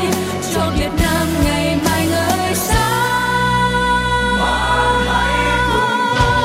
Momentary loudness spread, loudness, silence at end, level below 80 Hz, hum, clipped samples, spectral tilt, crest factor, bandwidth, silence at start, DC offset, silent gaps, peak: 3 LU; -16 LUFS; 0 s; -26 dBFS; none; under 0.1%; -4 dB/octave; 12 dB; 16.5 kHz; 0 s; under 0.1%; none; -2 dBFS